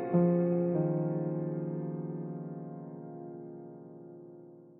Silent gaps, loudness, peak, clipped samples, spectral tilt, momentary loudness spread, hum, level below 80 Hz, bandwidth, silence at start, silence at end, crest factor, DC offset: none; -33 LUFS; -16 dBFS; under 0.1%; -13 dB/octave; 22 LU; none; -76 dBFS; 2.7 kHz; 0 s; 0 s; 18 dB; under 0.1%